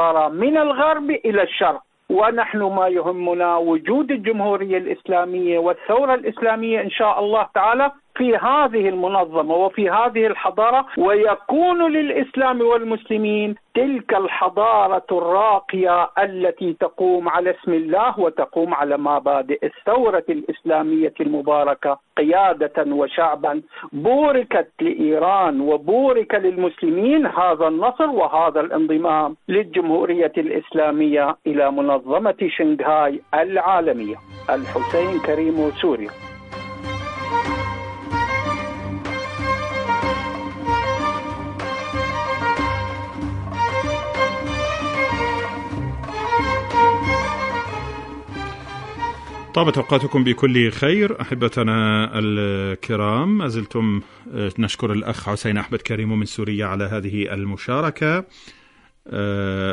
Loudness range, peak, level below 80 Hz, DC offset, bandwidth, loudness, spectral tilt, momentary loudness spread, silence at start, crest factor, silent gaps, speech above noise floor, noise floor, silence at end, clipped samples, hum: 5 LU; -2 dBFS; -44 dBFS; under 0.1%; 10.5 kHz; -19 LUFS; -6.5 dB/octave; 10 LU; 0 s; 18 dB; none; 34 dB; -53 dBFS; 0 s; under 0.1%; none